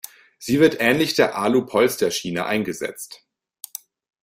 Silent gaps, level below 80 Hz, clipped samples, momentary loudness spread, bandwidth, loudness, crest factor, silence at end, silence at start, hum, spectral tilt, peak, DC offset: none; -60 dBFS; under 0.1%; 19 LU; 16 kHz; -20 LUFS; 20 dB; 1.1 s; 0.4 s; none; -4 dB/octave; -2 dBFS; under 0.1%